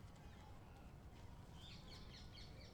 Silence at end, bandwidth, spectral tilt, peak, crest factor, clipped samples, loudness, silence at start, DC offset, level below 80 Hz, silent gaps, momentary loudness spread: 0 s; over 20 kHz; -5 dB/octave; -44 dBFS; 14 dB; under 0.1%; -59 LUFS; 0 s; under 0.1%; -62 dBFS; none; 4 LU